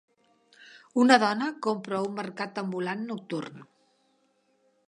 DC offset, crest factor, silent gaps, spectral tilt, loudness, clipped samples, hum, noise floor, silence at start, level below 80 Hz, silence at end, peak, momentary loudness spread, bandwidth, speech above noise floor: under 0.1%; 26 dB; none; -5 dB/octave; -27 LUFS; under 0.1%; none; -70 dBFS; 0.6 s; -82 dBFS; 1.25 s; -4 dBFS; 14 LU; 10.5 kHz; 43 dB